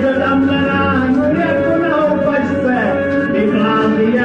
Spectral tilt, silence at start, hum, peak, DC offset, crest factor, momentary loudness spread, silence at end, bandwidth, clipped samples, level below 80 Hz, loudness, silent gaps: -8 dB/octave; 0 s; none; -4 dBFS; 0.1%; 10 dB; 2 LU; 0 s; 7.6 kHz; under 0.1%; -44 dBFS; -14 LUFS; none